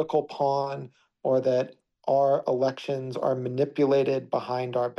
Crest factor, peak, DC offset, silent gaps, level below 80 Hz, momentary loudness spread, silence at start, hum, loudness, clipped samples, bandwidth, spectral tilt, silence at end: 14 dB; -12 dBFS; under 0.1%; none; -74 dBFS; 10 LU; 0 s; none; -26 LUFS; under 0.1%; 7.2 kHz; -7.5 dB/octave; 0.05 s